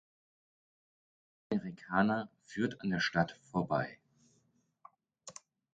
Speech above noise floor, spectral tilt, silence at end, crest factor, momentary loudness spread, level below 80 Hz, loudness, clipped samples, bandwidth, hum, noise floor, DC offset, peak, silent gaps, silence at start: 40 dB; -6 dB/octave; 0.45 s; 24 dB; 20 LU; -68 dBFS; -35 LUFS; under 0.1%; 9 kHz; none; -75 dBFS; under 0.1%; -14 dBFS; none; 1.5 s